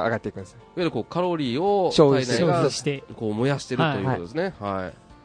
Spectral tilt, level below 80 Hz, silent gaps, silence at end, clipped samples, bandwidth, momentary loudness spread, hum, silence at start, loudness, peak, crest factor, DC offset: -6 dB/octave; -56 dBFS; none; 0.1 s; under 0.1%; 10.5 kHz; 12 LU; none; 0 s; -24 LUFS; -4 dBFS; 20 dB; under 0.1%